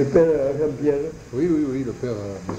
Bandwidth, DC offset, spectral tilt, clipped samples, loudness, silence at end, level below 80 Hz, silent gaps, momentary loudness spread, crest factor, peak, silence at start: 8.8 kHz; under 0.1%; -8 dB/octave; under 0.1%; -22 LUFS; 0 s; -46 dBFS; none; 11 LU; 18 dB; -4 dBFS; 0 s